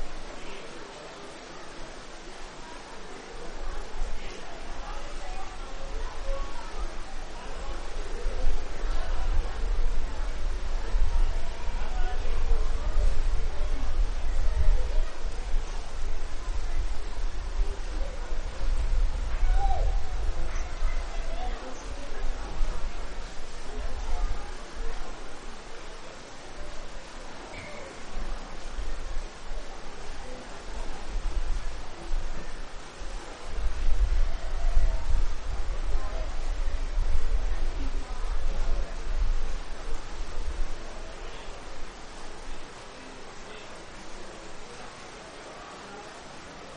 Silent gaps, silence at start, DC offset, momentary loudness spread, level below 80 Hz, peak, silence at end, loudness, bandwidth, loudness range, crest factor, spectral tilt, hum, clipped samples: none; 0 s; under 0.1%; 12 LU; -28 dBFS; -8 dBFS; 0 s; -37 LUFS; 9 kHz; 9 LU; 16 dB; -4.5 dB/octave; none; under 0.1%